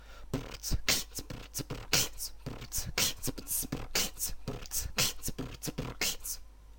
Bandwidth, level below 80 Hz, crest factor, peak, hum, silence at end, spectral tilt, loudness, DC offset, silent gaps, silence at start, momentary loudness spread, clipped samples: 17 kHz; -44 dBFS; 26 dB; -10 dBFS; none; 0 s; -2 dB/octave; -34 LUFS; under 0.1%; none; 0 s; 11 LU; under 0.1%